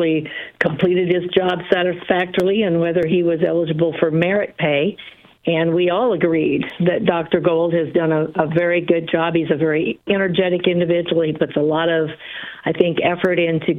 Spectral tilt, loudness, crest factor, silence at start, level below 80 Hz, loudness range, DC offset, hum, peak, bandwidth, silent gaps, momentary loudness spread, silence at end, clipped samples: -8.5 dB/octave; -18 LUFS; 18 dB; 0 s; -56 dBFS; 1 LU; under 0.1%; none; 0 dBFS; 5 kHz; none; 4 LU; 0 s; under 0.1%